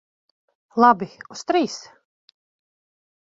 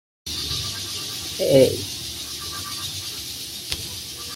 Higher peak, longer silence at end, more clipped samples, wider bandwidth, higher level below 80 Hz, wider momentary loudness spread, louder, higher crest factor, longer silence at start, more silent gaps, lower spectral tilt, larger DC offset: about the same, -2 dBFS vs -2 dBFS; first, 1.45 s vs 0 s; neither; second, 7.8 kHz vs 16.5 kHz; second, -70 dBFS vs -50 dBFS; first, 17 LU vs 13 LU; first, -20 LUFS vs -24 LUFS; about the same, 22 dB vs 22 dB; first, 0.75 s vs 0.25 s; neither; about the same, -4.5 dB/octave vs -3.5 dB/octave; neither